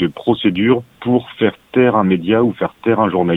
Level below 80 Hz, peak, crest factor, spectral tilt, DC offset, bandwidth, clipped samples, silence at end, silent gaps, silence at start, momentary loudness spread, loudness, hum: -50 dBFS; 0 dBFS; 16 dB; -9 dB/octave; under 0.1%; 4.1 kHz; under 0.1%; 0 s; none; 0 s; 5 LU; -16 LUFS; none